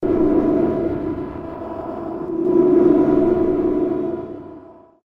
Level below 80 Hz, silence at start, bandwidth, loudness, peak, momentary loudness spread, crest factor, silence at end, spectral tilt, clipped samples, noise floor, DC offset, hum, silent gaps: -42 dBFS; 0 s; 3.9 kHz; -18 LUFS; -4 dBFS; 16 LU; 16 dB; 0.35 s; -10.5 dB/octave; under 0.1%; -42 dBFS; under 0.1%; none; none